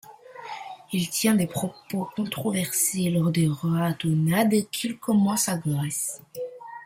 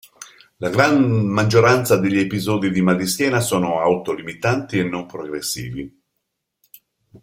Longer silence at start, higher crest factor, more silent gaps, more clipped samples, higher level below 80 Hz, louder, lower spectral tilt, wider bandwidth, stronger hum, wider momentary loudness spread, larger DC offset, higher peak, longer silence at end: second, 0.05 s vs 0.2 s; about the same, 16 dB vs 18 dB; neither; neither; second, -64 dBFS vs -54 dBFS; second, -25 LUFS vs -19 LUFS; about the same, -5 dB/octave vs -5.5 dB/octave; about the same, 16.5 kHz vs 16.5 kHz; neither; about the same, 15 LU vs 13 LU; neither; second, -10 dBFS vs -2 dBFS; about the same, 0 s vs 0.05 s